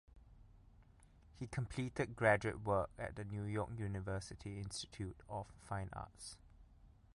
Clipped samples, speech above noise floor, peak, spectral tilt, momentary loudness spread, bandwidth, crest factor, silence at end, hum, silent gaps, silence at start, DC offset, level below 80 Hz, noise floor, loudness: under 0.1%; 24 dB; -18 dBFS; -5.5 dB/octave; 14 LU; 11.5 kHz; 24 dB; 0.25 s; none; none; 0.1 s; under 0.1%; -60 dBFS; -65 dBFS; -42 LUFS